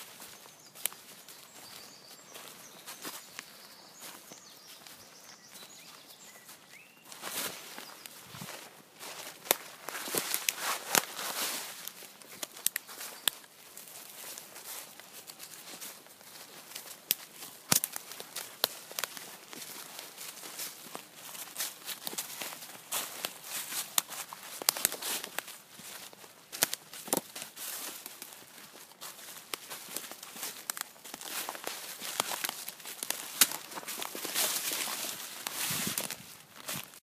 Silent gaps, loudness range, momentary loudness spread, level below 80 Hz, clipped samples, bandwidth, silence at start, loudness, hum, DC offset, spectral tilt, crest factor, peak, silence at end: none; 14 LU; 18 LU; -82 dBFS; under 0.1%; 15.5 kHz; 0 s; -35 LUFS; none; under 0.1%; 0 dB/octave; 38 dB; -2 dBFS; 0.05 s